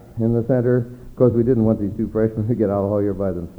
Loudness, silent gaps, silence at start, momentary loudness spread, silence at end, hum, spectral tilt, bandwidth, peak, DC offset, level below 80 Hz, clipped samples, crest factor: -20 LUFS; none; 0.1 s; 5 LU; 0.05 s; none; -11.5 dB/octave; 4.2 kHz; -4 dBFS; under 0.1%; -42 dBFS; under 0.1%; 16 dB